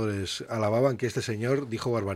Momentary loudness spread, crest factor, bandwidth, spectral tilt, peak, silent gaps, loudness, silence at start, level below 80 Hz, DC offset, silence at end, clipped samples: 6 LU; 16 dB; 15.5 kHz; -6 dB/octave; -12 dBFS; none; -28 LUFS; 0 s; -62 dBFS; under 0.1%; 0 s; under 0.1%